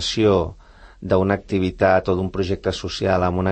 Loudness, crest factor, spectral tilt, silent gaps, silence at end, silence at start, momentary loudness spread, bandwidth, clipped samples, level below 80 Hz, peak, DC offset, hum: -20 LUFS; 16 dB; -6 dB/octave; none; 0 s; 0 s; 7 LU; 8.8 kHz; under 0.1%; -42 dBFS; -4 dBFS; under 0.1%; none